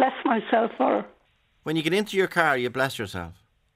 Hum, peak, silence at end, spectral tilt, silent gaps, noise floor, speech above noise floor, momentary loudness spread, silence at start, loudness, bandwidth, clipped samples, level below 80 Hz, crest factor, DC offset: none; -6 dBFS; 0.4 s; -5 dB/octave; none; -65 dBFS; 40 dB; 15 LU; 0 s; -24 LUFS; 16 kHz; under 0.1%; -60 dBFS; 20 dB; under 0.1%